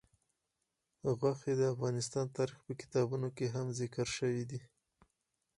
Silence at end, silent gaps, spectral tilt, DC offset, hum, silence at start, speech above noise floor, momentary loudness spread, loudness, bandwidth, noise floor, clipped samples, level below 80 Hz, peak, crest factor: 0.95 s; none; -6 dB/octave; under 0.1%; none; 1.05 s; 50 dB; 7 LU; -37 LUFS; 11.5 kHz; -86 dBFS; under 0.1%; -70 dBFS; -20 dBFS; 18 dB